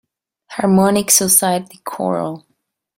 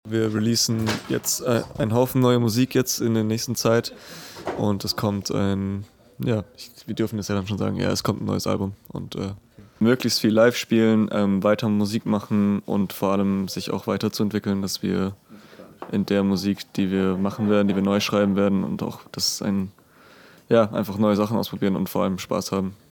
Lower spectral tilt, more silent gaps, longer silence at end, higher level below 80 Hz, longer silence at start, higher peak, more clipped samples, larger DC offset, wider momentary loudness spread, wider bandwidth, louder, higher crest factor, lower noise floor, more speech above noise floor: second, -3.5 dB/octave vs -5.5 dB/octave; neither; first, 0.6 s vs 0.2 s; about the same, -56 dBFS vs -58 dBFS; first, 0.5 s vs 0.05 s; first, 0 dBFS vs -4 dBFS; neither; neither; first, 19 LU vs 10 LU; second, 16.5 kHz vs 19 kHz; first, -14 LUFS vs -23 LUFS; about the same, 18 dB vs 20 dB; first, -69 dBFS vs -51 dBFS; first, 53 dB vs 28 dB